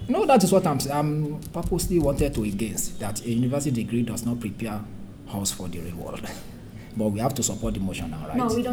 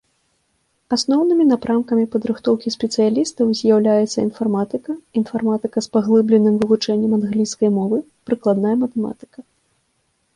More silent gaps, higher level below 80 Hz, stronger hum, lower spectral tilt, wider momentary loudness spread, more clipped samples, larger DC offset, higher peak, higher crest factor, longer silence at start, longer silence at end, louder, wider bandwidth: neither; first, -40 dBFS vs -60 dBFS; neither; about the same, -5.5 dB/octave vs -6 dB/octave; first, 15 LU vs 8 LU; neither; neither; about the same, -6 dBFS vs -4 dBFS; first, 20 dB vs 14 dB; second, 0 s vs 0.9 s; second, 0 s vs 0.95 s; second, -26 LUFS vs -18 LUFS; first, over 20 kHz vs 10.5 kHz